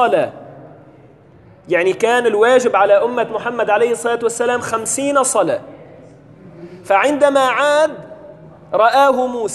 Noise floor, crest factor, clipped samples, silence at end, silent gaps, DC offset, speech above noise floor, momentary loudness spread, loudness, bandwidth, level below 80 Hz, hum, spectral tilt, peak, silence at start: -45 dBFS; 16 dB; under 0.1%; 0 s; none; under 0.1%; 30 dB; 8 LU; -15 LUFS; 12 kHz; -60 dBFS; none; -3 dB/octave; 0 dBFS; 0 s